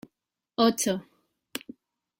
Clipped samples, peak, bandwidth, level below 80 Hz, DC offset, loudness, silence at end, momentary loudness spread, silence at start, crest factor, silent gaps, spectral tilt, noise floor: under 0.1%; -10 dBFS; 16.5 kHz; -68 dBFS; under 0.1%; -26 LUFS; 0.6 s; 16 LU; 0.6 s; 22 dB; none; -3.5 dB/octave; -82 dBFS